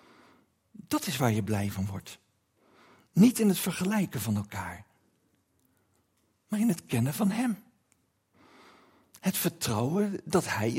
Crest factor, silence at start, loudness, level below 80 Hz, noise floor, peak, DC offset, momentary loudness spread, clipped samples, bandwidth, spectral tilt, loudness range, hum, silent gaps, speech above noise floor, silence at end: 20 dB; 0.9 s; -29 LUFS; -68 dBFS; -72 dBFS; -10 dBFS; under 0.1%; 14 LU; under 0.1%; 16.5 kHz; -5.5 dB/octave; 5 LU; none; none; 44 dB; 0 s